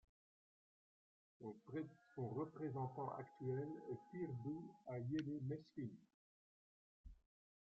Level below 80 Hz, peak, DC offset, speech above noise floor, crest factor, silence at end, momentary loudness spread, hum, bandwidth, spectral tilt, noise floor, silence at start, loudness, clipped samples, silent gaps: -76 dBFS; -32 dBFS; under 0.1%; over 42 dB; 18 dB; 0.5 s; 11 LU; none; 6.8 kHz; -8.5 dB/octave; under -90 dBFS; 1.4 s; -49 LUFS; under 0.1%; 6.14-7.04 s